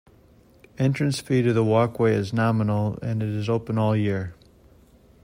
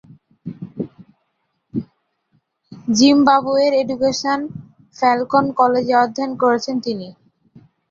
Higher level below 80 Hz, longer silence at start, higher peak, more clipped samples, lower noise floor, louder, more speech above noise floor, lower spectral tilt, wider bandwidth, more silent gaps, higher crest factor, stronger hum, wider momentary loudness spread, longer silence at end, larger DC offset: about the same, -56 dBFS vs -60 dBFS; first, 0.8 s vs 0.45 s; second, -8 dBFS vs -2 dBFS; neither; second, -54 dBFS vs -70 dBFS; second, -23 LUFS vs -17 LUFS; second, 32 dB vs 54 dB; first, -7.5 dB/octave vs -4.5 dB/octave; first, 16 kHz vs 7.6 kHz; neither; about the same, 16 dB vs 18 dB; neither; second, 6 LU vs 18 LU; about the same, 0.9 s vs 0.8 s; neither